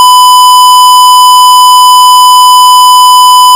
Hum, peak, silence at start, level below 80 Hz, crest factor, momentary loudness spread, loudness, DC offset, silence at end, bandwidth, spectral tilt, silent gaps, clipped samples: none; 0 dBFS; 0 s; -60 dBFS; 0 dB; 0 LU; 0 LUFS; 0.3%; 0 s; over 20 kHz; 3.5 dB/octave; none; 20%